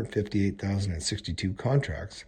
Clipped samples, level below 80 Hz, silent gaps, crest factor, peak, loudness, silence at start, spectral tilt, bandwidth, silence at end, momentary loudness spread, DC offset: under 0.1%; -46 dBFS; none; 18 dB; -12 dBFS; -29 LUFS; 0 s; -5.5 dB/octave; 9.8 kHz; 0.05 s; 4 LU; under 0.1%